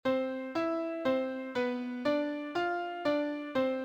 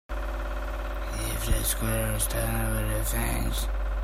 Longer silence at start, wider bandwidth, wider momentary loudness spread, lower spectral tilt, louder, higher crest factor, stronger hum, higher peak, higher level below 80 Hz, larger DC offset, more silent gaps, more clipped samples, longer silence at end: about the same, 0.05 s vs 0.1 s; second, 8.8 kHz vs 16 kHz; second, 3 LU vs 7 LU; first, -5.5 dB/octave vs -4 dB/octave; second, -33 LUFS vs -29 LUFS; about the same, 14 dB vs 16 dB; neither; second, -18 dBFS vs -12 dBFS; second, -72 dBFS vs -30 dBFS; neither; neither; neither; about the same, 0 s vs 0 s